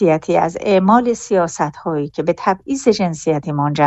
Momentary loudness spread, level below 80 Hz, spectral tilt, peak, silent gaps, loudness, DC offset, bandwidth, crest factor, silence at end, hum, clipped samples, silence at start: 7 LU; -52 dBFS; -6 dB/octave; 0 dBFS; none; -17 LUFS; under 0.1%; 8.4 kHz; 16 dB; 0 s; none; under 0.1%; 0 s